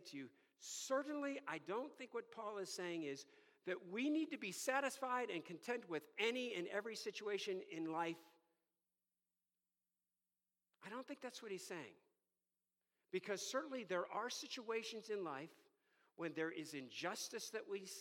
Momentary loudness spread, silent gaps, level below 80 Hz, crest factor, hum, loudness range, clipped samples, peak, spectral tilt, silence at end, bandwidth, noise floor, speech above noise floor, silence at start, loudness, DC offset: 11 LU; none; under -90 dBFS; 22 dB; none; 12 LU; under 0.1%; -26 dBFS; -3 dB/octave; 0 s; 17.5 kHz; under -90 dBFS; over 44 dB; 0 s; -46 LUFS; under 0.1%